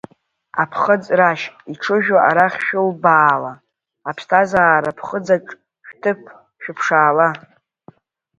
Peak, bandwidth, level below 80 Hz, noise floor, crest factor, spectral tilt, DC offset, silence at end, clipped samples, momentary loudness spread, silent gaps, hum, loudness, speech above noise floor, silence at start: 0 dBFS; 8 kHz; -62 dBFS; -49 dBFS; 18 dB; -6 dB/octave; under 0.1%; 1 s; under 0.1%; 16 LU; none; none; -16 LUFS; 32 dB; 0.55 s